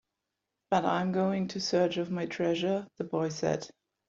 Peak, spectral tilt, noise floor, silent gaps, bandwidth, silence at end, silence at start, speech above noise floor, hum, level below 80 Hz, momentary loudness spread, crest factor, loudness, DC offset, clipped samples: -12 dBFS; -5.5 dB/octave; -86 dBFS; none; 7.6 kHz; 0.4 s; 0.7 s; 56 dB; none; -70 dBFS; 6 LU; 18 dB; -31 LUFS; under 0.1%; under 0.1%